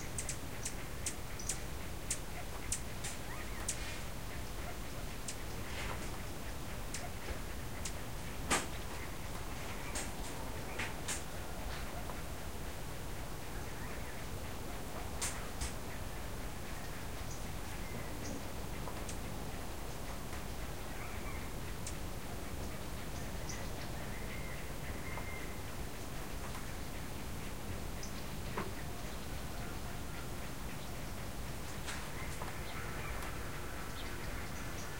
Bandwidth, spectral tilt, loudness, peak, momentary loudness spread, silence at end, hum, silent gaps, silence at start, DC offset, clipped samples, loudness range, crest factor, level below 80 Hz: 16 kHz; -3.5 dB/octave; -43 LUFS; -20 dBFS; 4 LU; 0 s; none; none; 0 s; 0.6%; under 0.1%; 3 LU; 24 dB; -48 dBFS